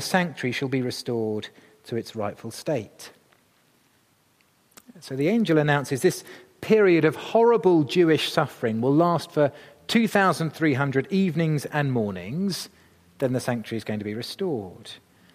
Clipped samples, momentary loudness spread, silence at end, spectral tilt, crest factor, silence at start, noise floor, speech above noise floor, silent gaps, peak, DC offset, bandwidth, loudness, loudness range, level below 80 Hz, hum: under 0.1%; 14 LU; 0.4 s; -6 dB/octave; 20 dB; 0 s; -63 dBFS; 40 dB; none; -4 dBFS; under 0.1%; 15.5 kHz; -24 LUFS; 12 LU; -68 dBFS; none